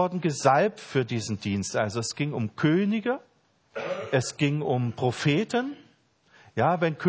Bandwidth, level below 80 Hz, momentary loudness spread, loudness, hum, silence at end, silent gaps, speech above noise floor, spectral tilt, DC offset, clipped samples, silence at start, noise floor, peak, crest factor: 8 kHz; -60 dBFS; 10 LU; -27 LUFS; none; 0 s; none; 36 dB; -5.5 dB/octave; under 0.1%; under 0.1%; 0 s; -62 dBFS; -6 dBFS; 20 dB